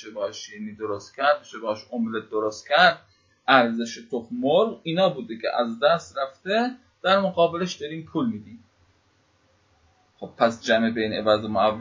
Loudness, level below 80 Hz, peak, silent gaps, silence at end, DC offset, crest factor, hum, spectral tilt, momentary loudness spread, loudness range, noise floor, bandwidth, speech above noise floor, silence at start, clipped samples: -24 LUFS; -62 dBFS; 0 dBFS; none; 0 s; under 0.1%; 24 dB; none; -4.5 dB/octave; 13 LU; 5 LU; -64 dBFS; 7.6 kHz; 40 dB; 0 s; under 0.1%